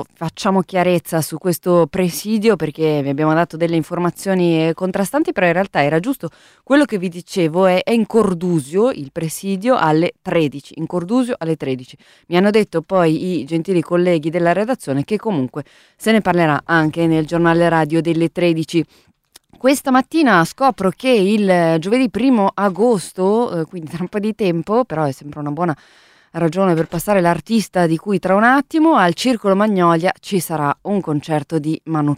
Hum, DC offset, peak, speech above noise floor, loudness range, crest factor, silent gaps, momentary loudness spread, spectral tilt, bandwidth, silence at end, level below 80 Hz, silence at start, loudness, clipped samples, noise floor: none; under 0.1%; 0 dBFS; 33 dB; 4 LU; 16 dB; none; 8 LU; -6 dB/octave; 16 kHz; 0 s; -54 dBFS; 0 s; -17 LUFS; under 0.1%; -49 dBFS